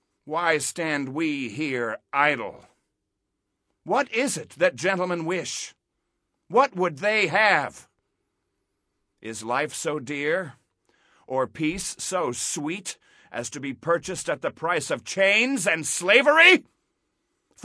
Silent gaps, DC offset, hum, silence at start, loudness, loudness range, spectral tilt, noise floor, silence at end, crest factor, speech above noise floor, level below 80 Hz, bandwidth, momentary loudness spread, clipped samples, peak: none; under 0.1%; none; 0.25 s; -23 LUFS; 10 LU; -3 dB/octave; -80 dBFS; 1 s; 24 dB; 56 dB; -64 dBFS; 11 kHz; 14 LU; under 0.1%; -2 dBFS